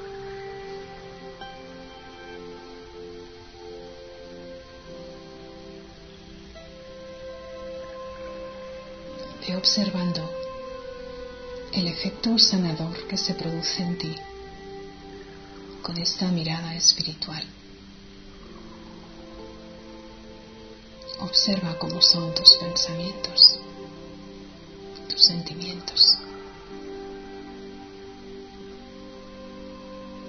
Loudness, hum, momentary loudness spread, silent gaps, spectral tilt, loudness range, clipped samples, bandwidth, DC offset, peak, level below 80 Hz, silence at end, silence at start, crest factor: -20 LUFS; none; 26 LU; none; -3 dB/octave; 24 LU; under 0.1%; 10.5 kHz; under 0.1%; 0 dBFS; -52 dBFS; 0 s; 0 s; 28 dB